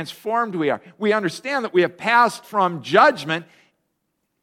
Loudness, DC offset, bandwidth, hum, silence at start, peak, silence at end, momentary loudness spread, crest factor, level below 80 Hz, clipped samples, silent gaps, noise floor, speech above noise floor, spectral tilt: -20 LUFS; under 0.1%; 16 kHz; none; 0 s; 0 dBFS; 1 s; 9 LU; 20 dB; -72 dBFS; under 0.1%; none; -74 dBFS; 54 dB; -5 dB/octave